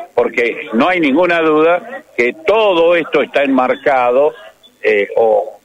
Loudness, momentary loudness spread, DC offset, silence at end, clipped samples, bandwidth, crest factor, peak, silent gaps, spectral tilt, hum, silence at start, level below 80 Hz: -13 LUFS; 5 LU; under 0.1%; 0.1 s; under 0.1%; 9.4 kHz; 10 dB; -2 dBFS; none; -5.5 dB/octave; none; 0 s; -54 dBFS